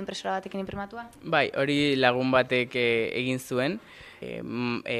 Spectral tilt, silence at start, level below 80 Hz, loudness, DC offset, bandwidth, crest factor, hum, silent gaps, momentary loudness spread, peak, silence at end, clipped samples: -5 dB/octave; 0 s; -60 dBFS; -26 LUFS; under 0.1%; 14.5 kHz; 22 dB; none; none; 16 LU; -4 dBFS; 0 s; under 0.1%